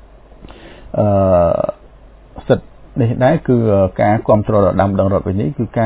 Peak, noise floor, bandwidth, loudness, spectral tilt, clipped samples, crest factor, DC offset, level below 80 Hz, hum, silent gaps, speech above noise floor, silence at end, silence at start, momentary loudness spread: 0 dBFS; -41 dBFS; 4 kHz; -15 LUFS; -12.5 dB/octave; under 0.1%; 16 dB; under 0.1%; -34 dBFS; none; none; 28 dB; 0 s; 0.4 s; 7 LU